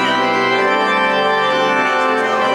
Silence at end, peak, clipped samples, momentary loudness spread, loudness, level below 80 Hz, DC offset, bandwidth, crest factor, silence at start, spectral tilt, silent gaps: 0 s; -4 dBFS; under 0.1%; 1 LU; -14 LUFS; -56 dBFS; under 0.1%; 16 kHz; 10 dB; 0 s; -3.5 dB/octave; none